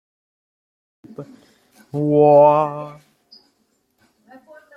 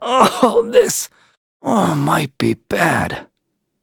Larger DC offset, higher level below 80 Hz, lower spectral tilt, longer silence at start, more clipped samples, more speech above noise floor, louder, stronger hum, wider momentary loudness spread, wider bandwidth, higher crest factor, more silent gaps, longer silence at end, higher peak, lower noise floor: neither; second, -68 dBFS vs -50 dBFS; first, -9.5 dB/octave vs -4.5 dB/octave; first, 1.2 s vs 0 s; neither; second, 51 dB vs 55 dB; about the same, -14 LUFS vs -16 LUFS; neither; first, 27 LU vs 12 LU; second, 5.4 kHz vs 20 kHz; about the same, 18 dB vs 16 dB; second, none vs 1.37-1.60 s; first, 1.85 s vs 0.6 s; about the same, -2 dBFS vs 0 dBFS; second, -66 dBFS vs -72 dBFS